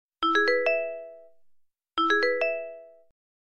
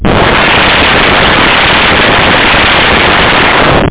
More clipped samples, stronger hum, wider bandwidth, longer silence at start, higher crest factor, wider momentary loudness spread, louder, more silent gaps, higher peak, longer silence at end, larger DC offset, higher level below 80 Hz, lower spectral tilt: neither; neither; first, 10 kHz vs 4 kHz; first, 0.2 s vs 0 s; first, 16 dB vs 6 dB; first, 18 LU vs 1 LU; second, -25 LUFS vs -4 LUFS; neither; second, -12 dBFS vs 0 dBFS; first, 0.4 s vs 0 s; neither; second, -72 dBFS vs -20 dBFS; second, -2 dB/octave vs -8 dB/octave